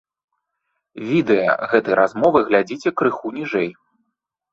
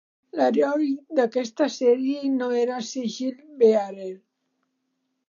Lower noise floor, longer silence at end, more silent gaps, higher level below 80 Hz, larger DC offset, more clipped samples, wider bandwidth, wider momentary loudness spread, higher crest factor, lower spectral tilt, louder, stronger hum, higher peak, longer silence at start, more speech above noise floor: about the same, -77 dBFS vs -76 dBFS; second, 0.8 s vs 1.1 s; neither; first, -60 dBFS vs -84 dBFS; neither; neither; about the same, 7.8 kHz vs 7.4 kHz; second, 8 LU vs 12 LU; about the same, 18 dB vs 18 dB; first, -7 dB/octave vs -4.5 dB/octave; first, -19 LUFS vs -23 LUFS; neither; first, -2 dBFS vs -6 dBFS; first, 0.95 s vs 0.35 s; first, 59 dB vs 53 dB